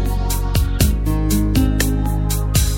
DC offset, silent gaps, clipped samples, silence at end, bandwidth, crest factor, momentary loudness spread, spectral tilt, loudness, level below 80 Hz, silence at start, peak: under 0.1%; none; under 0.1%; 0 s; 17 kHz; 16 dB; 3 LU; -5 dB/octave; -18 LUFS; -20 dBFS; 0 s; 0 dBFS